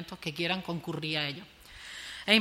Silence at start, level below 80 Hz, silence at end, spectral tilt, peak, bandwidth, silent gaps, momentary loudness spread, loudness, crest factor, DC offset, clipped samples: 0 s; -62 dBFS; 0 s; -4 dB/octave; -8 dBFS; 16 kHz; none; 13 LU; -32 LUFS; 26 dB; under 0.1%; under 0.1%